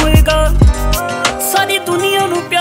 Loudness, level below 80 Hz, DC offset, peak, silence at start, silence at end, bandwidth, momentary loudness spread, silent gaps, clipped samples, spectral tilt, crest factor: -13 LUFS; -16 dBFS; under 0.1%; 0 dBFS; 0 s; 0 s; 16.5 kHz; 5 LU; none; under 0.1%; -4.5 dB/octave; 12 dB